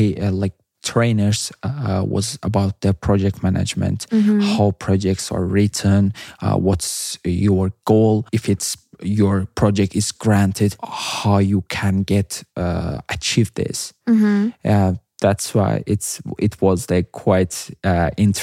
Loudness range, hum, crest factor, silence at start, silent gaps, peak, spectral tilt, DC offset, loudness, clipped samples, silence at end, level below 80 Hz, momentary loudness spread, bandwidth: 2 LU; none; 16 dB; 0 s; none; -2 dBFS; -6 dB/octave; under 0.1%; -19 LUFS; under 0.1%; 0 s; -46 dBFS; 7 LU; 15.5 kHz